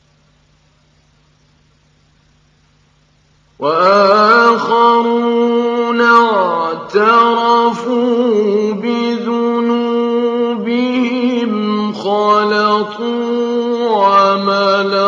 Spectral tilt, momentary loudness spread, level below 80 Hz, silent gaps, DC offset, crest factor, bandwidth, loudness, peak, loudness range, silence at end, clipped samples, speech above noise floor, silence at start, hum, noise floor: -5.5 dB/octave; 7 LU; -60 dBFS; none; under 0.1%; 14 dB; 7.6 kHz; -13 LUFS; 0 dBFS; 4 LU; 0 s; under 0.1%; 42 dB; 3.6 s; none; -53 dBFS